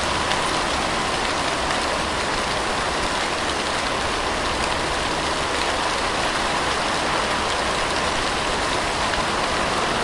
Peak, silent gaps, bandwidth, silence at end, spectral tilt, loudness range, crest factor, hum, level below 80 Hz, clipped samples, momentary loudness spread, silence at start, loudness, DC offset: -4 dBFS; none; 11.5 kHz; 0 s; -2.5 dB/octave; 1 LU; 20 dB; none; -38 dBFS; under 0.1%; 1 LU; 0 s; -22 LUFS; under 0.1%